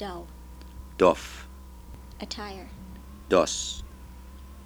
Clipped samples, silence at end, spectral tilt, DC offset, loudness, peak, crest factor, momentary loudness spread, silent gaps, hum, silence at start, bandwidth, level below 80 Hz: under 0.1%; 0 s; -4 dB/octave; under 0.1%; -27 LUFS; -6 dBFS; 24 dB; 24 LU; none; none; 0 s; over 20 kHz; -44 dBFS